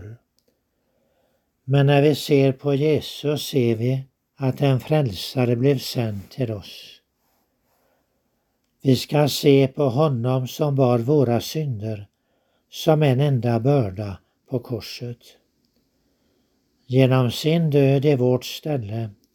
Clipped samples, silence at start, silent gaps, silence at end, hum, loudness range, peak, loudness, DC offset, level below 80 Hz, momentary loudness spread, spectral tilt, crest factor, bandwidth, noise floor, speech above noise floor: under 0.1%; 0 s; none; 0.2 s; none; 6 LU; -2 dBFS; -21 LUFS; under 0.1%; -60 dBFS; 14 LU; -7 dB/octave; 20 dB; 17 kHz; -71 dBFS; 51 dB